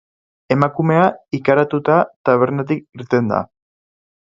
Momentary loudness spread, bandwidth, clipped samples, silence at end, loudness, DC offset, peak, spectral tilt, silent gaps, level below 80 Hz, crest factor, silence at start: 8 LU; 7.4 kHz; under 0.1%; 0.85 s; -17 LUFS; under 0.1%; 0 dBFS; -9 dB/octave; 2.16-2.24 s; -56 dBFS; 18 dB; 0.5 s